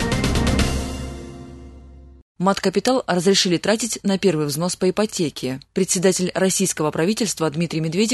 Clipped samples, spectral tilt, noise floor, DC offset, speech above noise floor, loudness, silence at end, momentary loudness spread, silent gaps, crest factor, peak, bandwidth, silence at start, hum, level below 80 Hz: under 0.1%; -4 dB/octave; -42 dBFS; under 0.1%; 22 dB; -20 LUFS; 0 s; 11 LU; 2.22-2.35 s; 16 dB; -4 dBFS; 12.5 kHz; 0 s; none; -34 dBFS